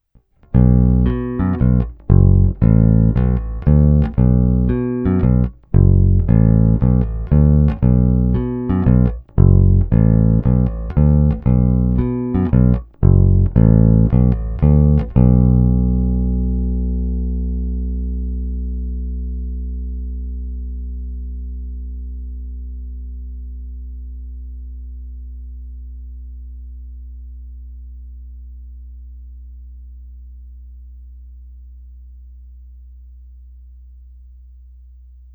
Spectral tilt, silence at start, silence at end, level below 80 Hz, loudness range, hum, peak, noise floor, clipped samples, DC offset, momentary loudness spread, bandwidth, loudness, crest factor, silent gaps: -14 dB/octave; 0.55 s; 1.75 s; -22 dBFS; 21 LU; none; 0 dBFS; -52 dBFS; under 0.1%; under 0.1%; 22 LU; 3 kHz; -16 LUFS; 16 dB; none